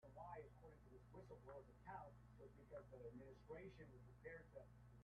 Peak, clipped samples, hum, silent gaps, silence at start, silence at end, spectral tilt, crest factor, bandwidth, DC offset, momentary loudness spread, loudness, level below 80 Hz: -44 dBFS; under 0.1%; 60 Hz at -70 dBFS; none; 0 s; 0 s; -6.5 dB/octave; 16 dB; 6.6 kHz; under 0.1%; 7 LU; -62 LUFS; -72 dBFS